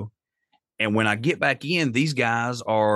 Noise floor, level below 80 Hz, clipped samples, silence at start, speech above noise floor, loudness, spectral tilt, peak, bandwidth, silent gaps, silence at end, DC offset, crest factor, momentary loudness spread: -71 dBFS; -68 dBFS; under 0.1%; 0 s; 48 dB; -23 LUFS; -5.5 dB/octave; -6 dBFS; 12.5 kHz; none; 0 s; under 0.1%; 18 dB; 4 LU